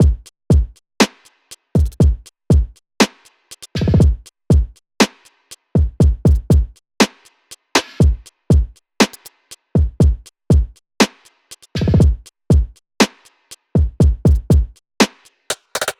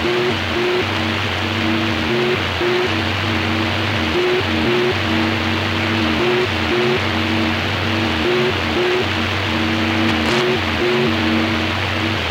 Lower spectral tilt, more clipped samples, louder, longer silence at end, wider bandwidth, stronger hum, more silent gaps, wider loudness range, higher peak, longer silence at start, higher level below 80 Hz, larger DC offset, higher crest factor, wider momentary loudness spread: about the same, -5.5 dB/octave vs -5 dB/octave; neither; about the same, -17 LUFS vs -17 LUFS; about the same, 0.1 s vs 0 s; about the same, 16 kHz vs 16 kHz; neither; neither; about the same, 2 LU vs 1 LU; about the same, -2 dBFS vs -2 dBFS; about the same, 0 s vs 0 s; first, -20 dBFS vs -40 dBFS; neither; about the same, 16 dB vs 14 dB; first, 15 LU vs 2 LU